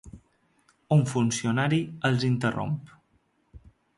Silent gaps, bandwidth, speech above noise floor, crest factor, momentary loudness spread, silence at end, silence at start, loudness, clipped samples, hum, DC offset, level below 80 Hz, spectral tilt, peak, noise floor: none; 11.5 kHz; 44 dB; 16 dB; 7 LU; 0.4 s; 0.05 s; -26 LUFS; under 0.1%; none; under 0.1%; -58 dBFS; -6 dB/octave; -10 dBFS; -69 dBFS